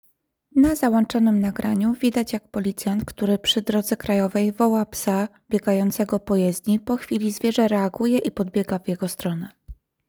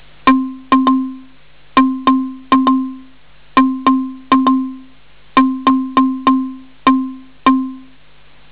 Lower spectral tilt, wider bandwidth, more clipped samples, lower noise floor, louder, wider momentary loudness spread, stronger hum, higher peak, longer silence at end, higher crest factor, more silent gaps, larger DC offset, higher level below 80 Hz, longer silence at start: second, -5.5 dB/octave vs -9 dB/octave; first, over 20 kHz vs 4 kHz; neither; first, -61 dBFS vs -48 dBFS; second, -22 LUFS vs -15 LUFS; about the same, 7 LU vs 6 LU; neither; about the same, -6 dBFS vs -4 dBFS; second, 0.35 s vs 0.7 s; about the same, 16 dB vs 12 dB; neither; second, under 0.1% vs 1%; about the same, -50 dBFS vs -48 dBFS; first, 0.55 s vs 0.25 s